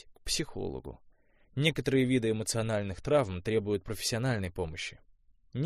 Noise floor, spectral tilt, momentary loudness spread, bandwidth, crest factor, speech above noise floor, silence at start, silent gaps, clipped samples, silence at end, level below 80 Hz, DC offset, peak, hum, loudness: -61 dBFS; -5 dB/octave; 12 LU; 15 kHz; 22 dB; 30 dB; 0.05 s; none; under 0.1%; 0 s; -52 dBFS; under 0.1%; -10 dBFS; none; -31 LUFS